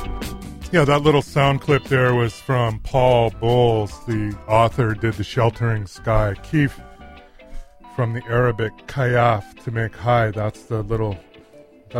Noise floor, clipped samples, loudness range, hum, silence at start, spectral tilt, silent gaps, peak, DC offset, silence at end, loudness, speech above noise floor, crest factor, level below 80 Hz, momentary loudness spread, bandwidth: -47 dBFS; under 0.1%; 5 LU; none; 0 s; -7 dB/octave; none; -2 dBFS; under 0.1%; 0 s; -20 LUFS; 28 dB; 18 dB; -36 dBFS; 10 LU; 14.5 kHz